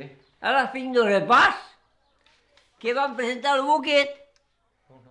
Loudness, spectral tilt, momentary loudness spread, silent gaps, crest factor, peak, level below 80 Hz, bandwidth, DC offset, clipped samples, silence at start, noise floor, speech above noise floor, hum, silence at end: -22 LUFS; -3.5 dB/octave; 11 LU; none; 16 dB; -8 dBFS; -64 dBFS; 10.5 kHz; under 0.1%; under 0.1%; 0 s; -69 dBFS; 48 dB; none; 0.95 s